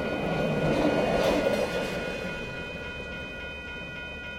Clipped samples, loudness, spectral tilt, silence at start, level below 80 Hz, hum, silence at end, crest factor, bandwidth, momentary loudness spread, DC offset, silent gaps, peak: under 0.1%; -29 LUFS; -5.5 dB/octave; 0 s; -46 dBFS; none; 0 s; 16 dB; 16.5 kHz; 12 LU; under 0.1%; none; -12 dBFS